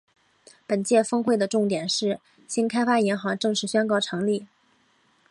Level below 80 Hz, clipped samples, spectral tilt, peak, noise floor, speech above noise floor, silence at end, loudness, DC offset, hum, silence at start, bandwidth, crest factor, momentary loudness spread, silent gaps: -72 dBFS; under 0.1%; -4 dB/octave; -8 dBFS; -64 dBFS; 40 dB; 0.85 s; -24 LUFS; under 0.1%; none; 0.7 s; 11.5 kHz; 16 dB; 7 LU; none